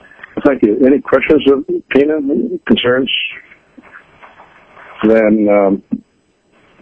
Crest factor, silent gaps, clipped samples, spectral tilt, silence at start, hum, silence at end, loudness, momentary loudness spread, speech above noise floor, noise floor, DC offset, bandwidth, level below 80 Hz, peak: 14 dB; none; under 0.1%; -7.5 dB/octave; 0.35 s; none; 0.85 s; -13 LUFS; 10 LU; 45 dB; -57 dBFS; under 0.1%; 5.4 kHz; -46 dBFS; 0 dBFS